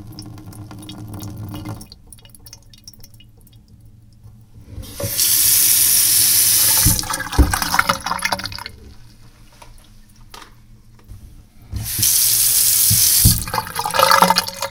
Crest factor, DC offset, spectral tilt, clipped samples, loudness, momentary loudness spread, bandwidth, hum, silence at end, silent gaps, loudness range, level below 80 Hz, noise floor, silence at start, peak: 20 dB; under 0.1%; -1.5 dB/octave; under 0.1%; -13 LUFS; 24 LU; 19 kHz; none; 0 s; none; 23 LU; -32 dBFS; -45 dBFS; 0 s; 0 dBFS